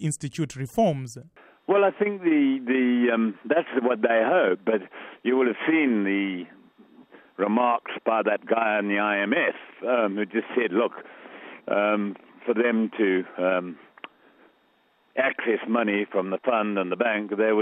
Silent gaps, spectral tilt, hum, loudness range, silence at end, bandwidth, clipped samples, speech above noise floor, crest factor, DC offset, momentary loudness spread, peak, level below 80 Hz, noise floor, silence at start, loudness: none; -6 dB/octave; none; 4 LU; 0 s; 12.5 kHz; under 0.1%; 40 dB; 16 dB; under 0.1%; 15 LU; -8 dBFS; -70 dBFS; -64 dBFS; 0 s; -24 LUFS